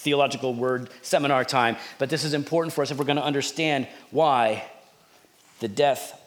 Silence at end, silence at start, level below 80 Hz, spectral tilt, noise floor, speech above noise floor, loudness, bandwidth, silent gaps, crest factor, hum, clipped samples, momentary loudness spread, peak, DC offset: 0.1 s; 0 s; -80 dBFS; -4.5 dB/octave; -57 dBFS; 33 dB; -24 LUFS; over 20 kHz; none; 20 dB; none; under 0.1%; 8 LU; -6 dBFS; under 0.1%